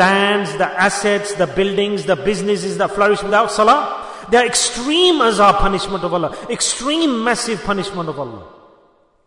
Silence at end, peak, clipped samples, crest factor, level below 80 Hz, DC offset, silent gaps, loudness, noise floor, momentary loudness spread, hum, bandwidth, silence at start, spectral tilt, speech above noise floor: 0.75 s; -2 dBFS; under 0.1%; 14 dB; -36 dBFS; under 0.1%; none; -16 LUFS; -54 dBFS; 9 LU; none; 11 kHz; 0 s; -3 dB/octave; 38 dB